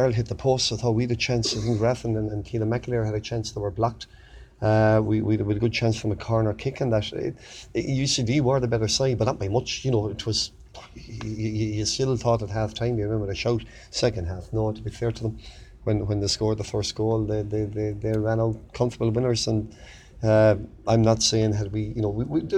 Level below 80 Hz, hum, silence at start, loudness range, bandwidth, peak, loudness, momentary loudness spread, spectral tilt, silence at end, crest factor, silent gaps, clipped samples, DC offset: -44 dBFS; none; 0 s; 4 LU; 10.5 kHz; -6 dBFS; -25 LUFS; 9 LU; -5.5 dB/octave; 0 s; 18 dB; none; under 0.1%; under 0.1%